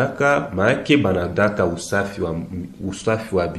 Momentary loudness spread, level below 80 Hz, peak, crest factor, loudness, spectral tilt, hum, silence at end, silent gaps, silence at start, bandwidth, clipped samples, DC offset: 11 LU; -46 dBFS; -4 dBFS; 16 dB; -20 LUFS; -6 dB/octave; none; 0 s; none; 0 s; 13 kHz; under 0.1%; under 0.1%